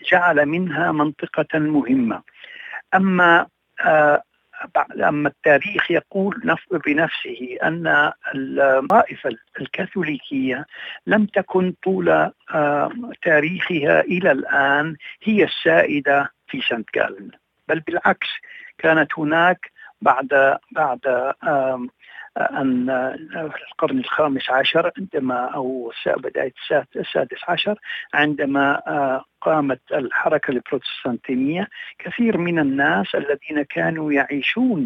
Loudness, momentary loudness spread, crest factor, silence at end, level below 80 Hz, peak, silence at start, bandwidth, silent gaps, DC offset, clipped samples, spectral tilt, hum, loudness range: -20 LUFS; 11 LU; 18 dB; 0 s; -64 dBFS; -2 dBFS; 0.05 s; 7 kHz; none; under 0.1%; under 0.1%; -7.5 dB/octave; none; 4 LU